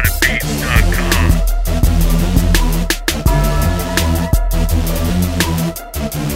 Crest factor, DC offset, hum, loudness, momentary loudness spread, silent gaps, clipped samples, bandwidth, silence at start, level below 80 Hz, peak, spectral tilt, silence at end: 14 dB; under 0.1%; none; -16 LUFS; 3 LU; none; under 0.1%; 16.5 kHz; 0 s; -16 dBFS; 0 dBFS; -4.5 dB/octave; 0 s